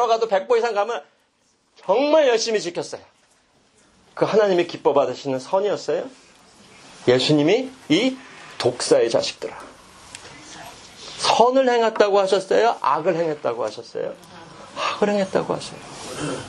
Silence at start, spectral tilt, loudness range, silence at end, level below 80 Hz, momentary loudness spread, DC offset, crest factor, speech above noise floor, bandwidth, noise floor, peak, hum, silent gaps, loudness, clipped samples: 0 s; -4.5 dB/octave; 4 LU; 0 s; -64 dBFS; 22 LU; under 0.1%; 20 dB; 44 dB; 11.5 kHz; -64 dBFS; 0 dBFS; none; none; -20 LUFS; under 0.1%